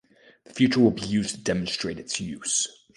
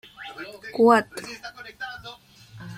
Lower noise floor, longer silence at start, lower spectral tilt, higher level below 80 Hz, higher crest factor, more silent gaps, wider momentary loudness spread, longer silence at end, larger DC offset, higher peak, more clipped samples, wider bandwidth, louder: first, -54 dBFS vs -47 dBFS; first, 0.5 s vs 0.2 s; about the same, -4 dB/octave vs -5 dB/octave; first, -54 dBFS vs -62 dBFS; about the same, 20 dB vs 22 dB; neither; second, 10 LU vs 22 LU; first, 0.25 s vs 0 s; neither; about the same, -6 dBFS vs -4 dBFS; neither; second, 11.5 kHz vs 15.5 kHz; second, -25 LUFS vs -21 LUFS